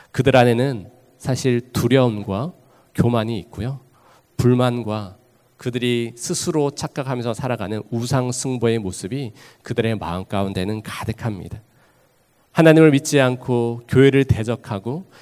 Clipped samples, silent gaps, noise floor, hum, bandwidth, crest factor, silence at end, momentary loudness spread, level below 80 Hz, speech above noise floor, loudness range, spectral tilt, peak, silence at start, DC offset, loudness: under 0.1%; none; -59 dBFS; none; 16 kHz; 20 dB; 0.2 s; 15 LU; -44 dBFS; 40 dB; 7 LU; -6 dB/octave; 0 dBFS; 0.15 s; under 0.1%; -20 LUFS